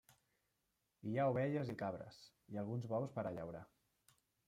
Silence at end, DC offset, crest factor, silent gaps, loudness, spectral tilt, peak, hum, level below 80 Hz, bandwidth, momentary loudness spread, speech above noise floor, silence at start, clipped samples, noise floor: 0.8 s; under 0.1%; 18 dB; none; -43 LUFS; -8.5 dB/octave; -26 dBFS; none; -78 dBFS; 14.5 kHz; 15 LU; 44 dB; 0.1 s; under 0.1%; -86 dBFS